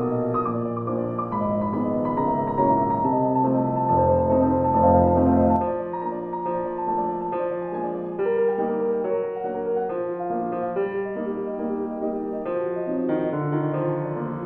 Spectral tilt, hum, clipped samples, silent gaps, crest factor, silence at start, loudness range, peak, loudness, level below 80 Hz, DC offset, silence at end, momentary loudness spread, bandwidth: -12 dB/octave; none; under 0.1%; none; 16 dB; 0 s; 7 LU; -6 dBFS; -24 LUFS; -48 dBFS; under 0.1%; 0 s; 9 LU; 4 kHz